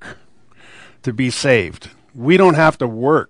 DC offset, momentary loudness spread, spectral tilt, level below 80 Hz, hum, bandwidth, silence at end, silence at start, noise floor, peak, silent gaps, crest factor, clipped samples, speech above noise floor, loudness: under 0.1%; 14 LU; -6 dB/octave; -52 dBFS; none; 10.5 kHz; 0.05 s; 0 s; -51 dBFS; 0 dBFS; none; 16 dB; under 0.1%; 37 dB; -15 LUFS